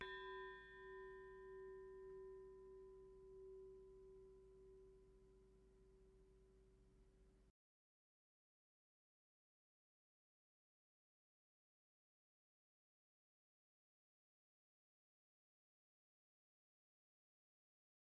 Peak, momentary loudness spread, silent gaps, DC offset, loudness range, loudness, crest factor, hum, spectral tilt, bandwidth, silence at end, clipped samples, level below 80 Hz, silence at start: -36 dBFS; 12 LU; none; under 0.1%; 10 LU; -60 LUFS; 28 dB; none; -2.5 dB/octave; 4.9 kHz; 10.6 s; under 0.1%; -78 dBFS; 0 s